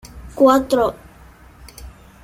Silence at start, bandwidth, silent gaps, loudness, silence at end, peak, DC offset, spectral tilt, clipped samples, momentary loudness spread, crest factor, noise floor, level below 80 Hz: 0.05 s; 16.5 kHz; none; -16 LUFS; 0.35 s; -2 dBFS; under 0.1%; -5.5 dB/octave; under 0.1%; 26 LU; 18 dB; -45 dBFS; -42 dBFS